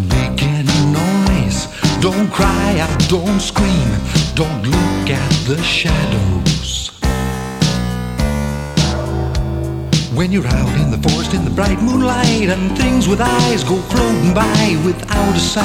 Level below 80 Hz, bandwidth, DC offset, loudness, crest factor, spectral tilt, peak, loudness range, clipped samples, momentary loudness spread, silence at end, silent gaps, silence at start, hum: -24 dBFS; 16.5 kHz; under 0.1%; -15 LUFS; 14 dB; -5 dB/octave; 0 dBFS; 3 LU; under 0.1%; 5 LU; 0 s; none; 0 s; none